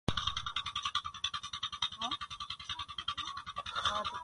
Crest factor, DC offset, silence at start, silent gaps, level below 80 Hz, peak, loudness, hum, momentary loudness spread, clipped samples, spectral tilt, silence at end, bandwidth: 26 dB; under 0.1%; 0.1 s; none; -56 dBFS; -14 dBFS; -37 LUFS; none; 6 LU; under 0.1%; -2.5 dB/octave; 0 s; 11.5 kHz